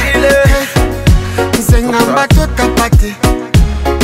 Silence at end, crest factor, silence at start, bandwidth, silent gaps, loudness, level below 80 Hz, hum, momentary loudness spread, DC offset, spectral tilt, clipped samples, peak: 0 s; 10 dB; 0 s; 16.5 kHz; none; -11 LUFS; -14 dBFS; none; 5 LU; under 0.1%; -5.5 dB/octave; under 0.1%; 0 dBFS